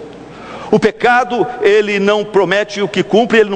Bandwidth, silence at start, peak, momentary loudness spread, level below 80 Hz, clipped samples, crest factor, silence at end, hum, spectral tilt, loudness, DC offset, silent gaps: 9.2 kHz; 0 s; 0 dBFS; 17 LU; -52 dBFS; under 0.1%; 14 dB; 0 s; none; -5 dB/octave; -13 LUFS; under 0.1%; none